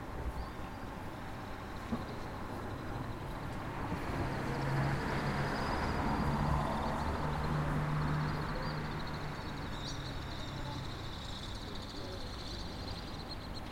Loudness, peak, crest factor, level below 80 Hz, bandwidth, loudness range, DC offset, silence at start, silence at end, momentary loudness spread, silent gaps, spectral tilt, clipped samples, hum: -38 LUFS; -20 dBFS; 16 dB; -46 dBFS; 16.5 kHz; 8 LU; under 0.1%; 0 s; 0 s; 9 LU; none; -6 dB/octave; under 0.1%; none